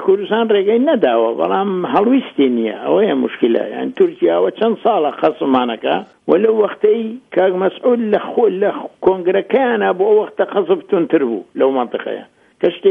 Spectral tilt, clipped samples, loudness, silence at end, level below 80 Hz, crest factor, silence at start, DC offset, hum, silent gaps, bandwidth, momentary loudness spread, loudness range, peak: -8.5 dB/octave; under 0.1%; -16 LUFS; 0 s; -62 dBFS; 14 dB; 0 s; under 0.1%; none; none; 3.9 kHz; 6 LU; 1 LU; 0 dBFS